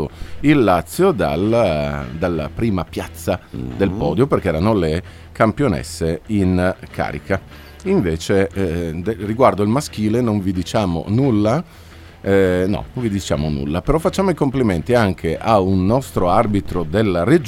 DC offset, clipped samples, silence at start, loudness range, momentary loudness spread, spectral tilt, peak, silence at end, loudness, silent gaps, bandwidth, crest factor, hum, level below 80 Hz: under 0.1%; under 0.1%; 0 s; 3 LU; 8 LU; -7 dB/octave; 0 dBFS; 0 s; -18 LUFS; none; 16.5 kHz; 18 dB; none; -36 dBFS